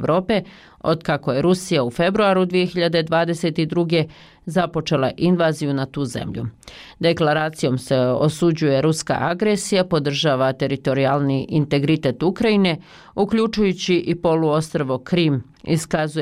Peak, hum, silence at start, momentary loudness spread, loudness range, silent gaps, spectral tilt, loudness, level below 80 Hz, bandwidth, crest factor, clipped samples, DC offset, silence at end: -8 dBFS; none; 0 s; 6 LU; 2 LU; none; -6 dB/octave; -20 LUFS; -50 dBFS; 15.5 kHz; 12 dB; under 0.1%; under 0.1%; 0 s